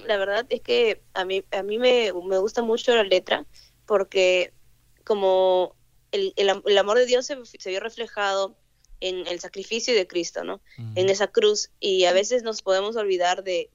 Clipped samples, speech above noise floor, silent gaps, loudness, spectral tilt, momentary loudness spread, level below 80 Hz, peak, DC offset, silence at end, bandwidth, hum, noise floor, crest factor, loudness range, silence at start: under 0.1%; 33 dB; none; -23 LUFS; -3 dB/octave; 11 LU; -60 dBFS; -6 dBFS; under 0.1%; 0.1 s; 8 kHz; none; -56 dBFS; 18 dB; 4 LU; 0 s